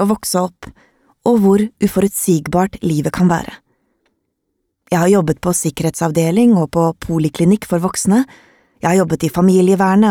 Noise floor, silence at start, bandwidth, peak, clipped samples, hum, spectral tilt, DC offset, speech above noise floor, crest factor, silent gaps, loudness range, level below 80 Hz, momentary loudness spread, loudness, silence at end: -71 dBFS; 0 s; 17 kHz; -2 dBFS; under 0.1%; none; -6 dB/octave; under 0.1%; 57 dB; 14 dB; none; 3 LU; -44 dBFS; 7 LU; -15 LUFS; 0 s